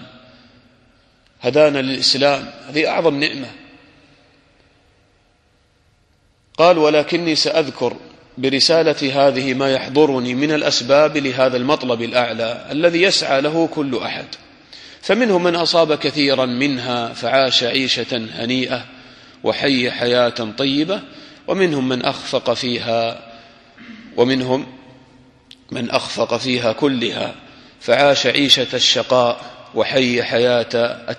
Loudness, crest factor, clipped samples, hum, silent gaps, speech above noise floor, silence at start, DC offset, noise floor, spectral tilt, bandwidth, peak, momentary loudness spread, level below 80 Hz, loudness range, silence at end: -17 LUFS; 18 dB; under 0.1%; none; none; 41 dB; 0 s; under 0.1%; -58 dBFS; -4 dB/octave; 12 kHz; 0 dBFS; 12 LU; -58 dBFS; 6 LU; 0 s